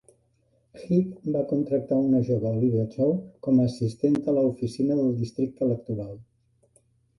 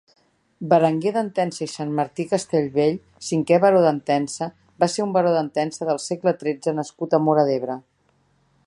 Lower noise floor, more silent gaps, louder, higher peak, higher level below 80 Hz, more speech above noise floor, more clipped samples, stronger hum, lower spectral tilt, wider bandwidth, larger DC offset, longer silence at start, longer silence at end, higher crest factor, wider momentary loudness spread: about the same, -67 dBFS vs -64 dBFS; neither; second, -25 LUFS vs -22 LUFS; second, -10 dBFS vs -4 dBFS; first, -60 dBFS vs -66 dBFS; about the same, 43 dB vs 43 dB; neither; neither; first, -9.5 dB/octave vs -6 dB/octave; about the same, 11.5 kHz vs 11.5 kHz; neither; first, 0.75 s vs 0.6 s; about the same, 0.95 s vs 0.85 s; about the same, 16 dB vs 18 dB; second, 7 LU vs 11 LU